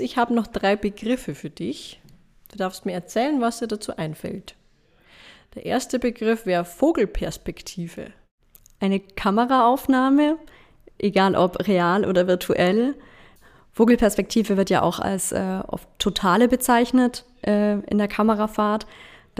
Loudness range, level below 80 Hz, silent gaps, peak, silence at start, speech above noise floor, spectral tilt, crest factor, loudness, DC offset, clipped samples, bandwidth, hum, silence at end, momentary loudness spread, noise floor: 7 LU; -46 dBFS; 8.31-8.38 s; -4 dBFS; 0 s; 37 dB; -5 dB/octave; 18 dB; -22 LUFS; under 0.1%; under 0.1%; 15.5 kHz; none; 0.35 s; 15 LU; -58 dBFS